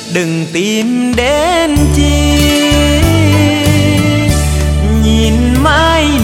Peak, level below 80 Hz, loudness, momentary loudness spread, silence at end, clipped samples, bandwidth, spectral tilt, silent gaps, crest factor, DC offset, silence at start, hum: 0 dBFS; -16 dBFS; -10 LUFS; 4 LU; 0 s; 0.4%; 16.5 kHz; -5 dB/octave; none; 10 dB; under 0.1%; 0 s; none